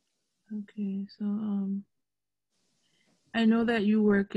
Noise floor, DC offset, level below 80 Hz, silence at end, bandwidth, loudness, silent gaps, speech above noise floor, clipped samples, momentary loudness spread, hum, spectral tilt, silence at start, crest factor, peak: under -90 dBFS; under 0.1%; -66 dBFS; 0.05 s; 8 kHz; -29 LUFS; none; over 62 dB; under 0.1%; 15 LU; none; -8 dB/octave; 0.5 s; 16 dB; -14 dBFS